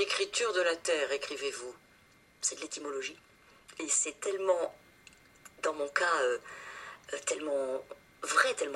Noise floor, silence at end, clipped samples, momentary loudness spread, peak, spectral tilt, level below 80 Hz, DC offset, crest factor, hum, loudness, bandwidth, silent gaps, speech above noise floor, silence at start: -62 dBFS; 0 s; under 0.1%; 15 LU; -10 dBFS; 0 dB/octave; -74 dBFS; under 0.1%; 24 dB; none; -32 LUFS; 15 kHz; none; 30 dB; 0 s